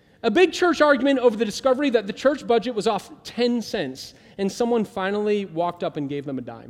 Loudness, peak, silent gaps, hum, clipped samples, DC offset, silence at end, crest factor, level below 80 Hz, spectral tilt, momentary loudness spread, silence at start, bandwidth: -22 LUFS; -4 dBFS; none; none; under 0.1%; under 0.1%; 0 s; 18 dB; -60 dBFS; -5 dB/octave; 11 LU; 0.25 s; 14.5 kHz